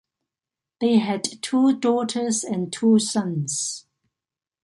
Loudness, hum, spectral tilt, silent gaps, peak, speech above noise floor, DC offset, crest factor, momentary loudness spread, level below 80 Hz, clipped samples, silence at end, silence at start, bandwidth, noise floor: -22 LUFS; none; -4.5 dB/octave; none; -8 dBFS; 68 dB; under 0.1%; 16 dB; 7 LU; -70 dBFS; under 0.1%; 0.85 s; 0.8 s; 11.5 kHz; -89 dBFS